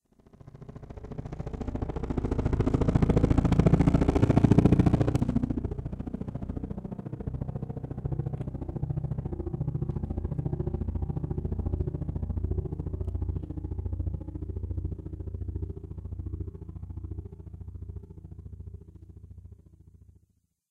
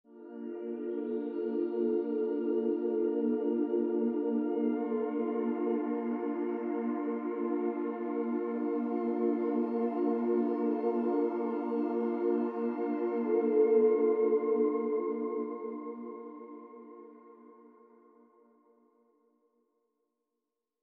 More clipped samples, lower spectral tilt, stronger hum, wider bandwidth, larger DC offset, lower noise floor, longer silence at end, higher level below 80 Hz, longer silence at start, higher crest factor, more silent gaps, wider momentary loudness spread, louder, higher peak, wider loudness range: neither; about the same, -9.5 dB/octave vs -10 dB/octave; neither; first, 9.4 kHz vs 4.2 kHz; neither; second, -70 dBFS vs -87 dBFS; second, 1.15 s vs 3.2 s; first, -36 dBFS vs under -90 dBFS; first, 0.45 s vs 0.1 s; first, 24 dB vs 16 dB; neither; first, 21 LU vs 12 LU; about the same, -30 LUFS vs -32 LUFS; first, -6 dBFS vs -16 dBFS; first, 17 LU vs 7 LU